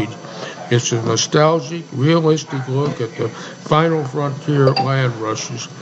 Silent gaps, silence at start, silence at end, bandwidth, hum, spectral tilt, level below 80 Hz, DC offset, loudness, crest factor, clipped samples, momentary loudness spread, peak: none; 0 s; 0 s; 8 kHz; none; -5 dB/octave; -58 dBFS; under 0.1%; -18 LUFS; 18 dB; under 0.1%; 12 LU; 0 dBFS